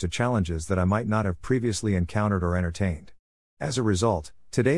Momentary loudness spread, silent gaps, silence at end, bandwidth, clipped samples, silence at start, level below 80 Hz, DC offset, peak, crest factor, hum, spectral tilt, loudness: 6 LU; 3.19-3.57 s; 0 s; 12 kHz; under 0.1%; 0 s; -46 dBFS; 0.4%; -8 dBFS; 16 dB; none; -6 dB/octave; -26 LUFS